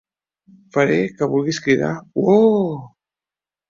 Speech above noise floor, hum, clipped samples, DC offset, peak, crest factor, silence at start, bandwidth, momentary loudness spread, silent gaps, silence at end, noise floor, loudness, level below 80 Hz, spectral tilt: over 72 dB; none; under 0.1%; under 0.1%; -2 dBFS; 18 dB; 0.75 s; 7.6 kHz; 10 LU; none; 0.8 s; under -90 dBFS; -18 LUFS; -60 dBFS; -6.5 dB/octave